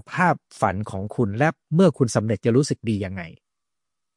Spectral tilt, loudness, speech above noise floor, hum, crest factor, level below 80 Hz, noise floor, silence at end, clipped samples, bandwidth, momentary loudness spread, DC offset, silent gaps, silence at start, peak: -6.5 dB/octave; -22 LUFS; 64 dB; none; 18 dB; -60 dBFS; -86 dBFS; 0.85 s; under 0.1%; 11.5 kHz; 11 LU; under 0.1%; none; 0.1 s; -4 dBFS